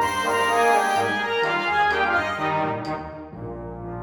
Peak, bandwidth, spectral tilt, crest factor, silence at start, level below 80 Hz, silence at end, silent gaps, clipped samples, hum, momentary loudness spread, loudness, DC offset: -8 dBFS; 18 kHz; -4 dB/octave; 16 dB; 0 s; -50 dBFS; 0 s; none; under 0.1%; none; 16 LU; -22 LUFS; under 0.1%